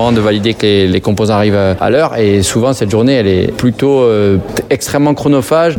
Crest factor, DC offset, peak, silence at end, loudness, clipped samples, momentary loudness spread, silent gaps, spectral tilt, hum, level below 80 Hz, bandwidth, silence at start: 10 dB; under 0.1%; 0 dBFS; 0 s; -11 LUFS; under 0.1%; 3 LU; none; -5.5 dB/octave; none; -40 dBFS; 18 kHz; 0 s